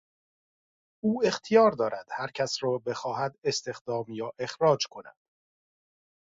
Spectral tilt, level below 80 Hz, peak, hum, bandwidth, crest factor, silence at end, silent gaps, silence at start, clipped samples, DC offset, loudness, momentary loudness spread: -4.5 dB/octave; -72 dBFS; -8 dBFS; none; 7.8 kHz; 22 dB; 1.1 s; 3.38-3.42 s, 3.81-3.85 s; 1.05 s; under 0.1%; under 0.1%; -28 LUFS; 13 LU